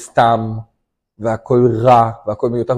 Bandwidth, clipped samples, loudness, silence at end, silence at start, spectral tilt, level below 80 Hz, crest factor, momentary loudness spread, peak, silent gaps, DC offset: 11.5 kHz; under 0.1%; -15 LUFS; 0 s; 0 s; -7.5 dB/octave; -46 dBFS; 14 dB; 13 LU; 0 dBFS; none; under 0.1%